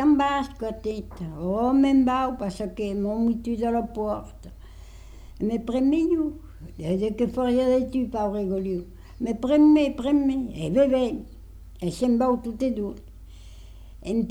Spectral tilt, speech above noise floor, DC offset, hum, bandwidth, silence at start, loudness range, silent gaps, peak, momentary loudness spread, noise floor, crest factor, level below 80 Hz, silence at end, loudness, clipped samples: -7 dB/octave; 20 dB; under 0.1%; none; 12 kHz; 0 s; 5 LU; none; -10 dBFS; 14 LU; -43 dBFS; 14 dB; -44 dBFS; 0 s; -24 LUFS; under 0.1%